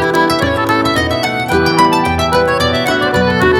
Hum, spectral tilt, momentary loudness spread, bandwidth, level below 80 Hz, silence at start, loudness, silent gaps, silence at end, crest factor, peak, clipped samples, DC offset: none; -5 dB/octave; 3 LU; 18 kHz; -34 dBFS; 0 s; -13 LUFS; none; 0 s; 12 dB; 0 dBFS; under 0.1%; under 0.1%